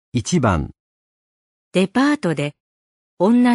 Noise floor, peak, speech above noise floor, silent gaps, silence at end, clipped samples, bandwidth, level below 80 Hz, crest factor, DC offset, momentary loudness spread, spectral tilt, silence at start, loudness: under -90 dBFS; -2 dBFS; over 73 dB; 0.80-1.72 s, 2.60-3.17 s; 0 s; under 0.1%; 11.5 kHz; -42 dBFS; 18 dB; under 0.1%; 8 LU; -6 dB/octave; 0.15 s; -19 LUFS